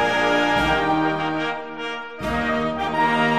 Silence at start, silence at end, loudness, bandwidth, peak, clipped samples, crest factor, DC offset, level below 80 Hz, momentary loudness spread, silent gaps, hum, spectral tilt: 0 s; 0 s; -21 LUFS; 15 kHz; -6 dBFS; under 0.1%; 16 dB; 0.5%; -42 dBFS; 10 LU; none; none; -5 dB/octave